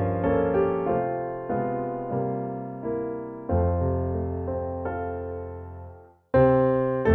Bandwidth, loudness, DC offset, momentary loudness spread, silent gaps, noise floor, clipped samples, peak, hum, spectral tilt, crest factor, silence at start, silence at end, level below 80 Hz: 4.3 kHz; -26 LUFS; under 0.1%; 13 LU; none; -46 dBFS; under 0.1%; -8 dBFS; none; -11.5 dB/octave; 18 dB; 0 s; 0 s; -42 dBFS